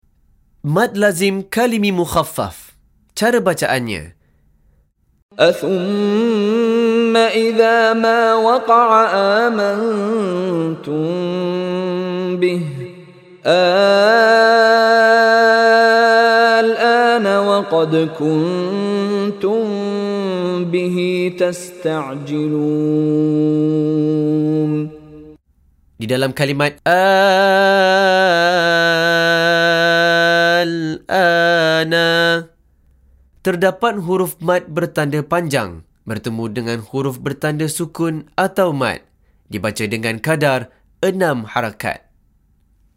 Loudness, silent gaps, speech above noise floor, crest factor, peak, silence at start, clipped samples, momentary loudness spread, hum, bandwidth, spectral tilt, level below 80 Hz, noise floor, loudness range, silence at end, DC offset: -15 LUFS; 5.22-5.29 s; 42 dB; 16 dB; 0 dBFS; 0.65 s; under 0.1%; 12 LU; none; 16 kHz; -5 dB/octave; -54 dBFS; -57 dBFS; 8 LU; 1 s; under 0.1%